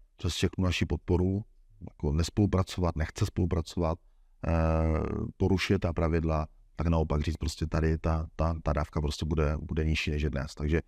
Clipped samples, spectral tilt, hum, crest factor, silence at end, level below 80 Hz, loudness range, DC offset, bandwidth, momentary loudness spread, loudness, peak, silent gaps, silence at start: under 0.1%; -6.5 dB/octave; none; 16 dB; 0.05 s; -38 dBFS; 1 LU; under 0.1%; 13 kHz; 7 LU; -30 LUFS; -14 dBFS; none; 0.2 s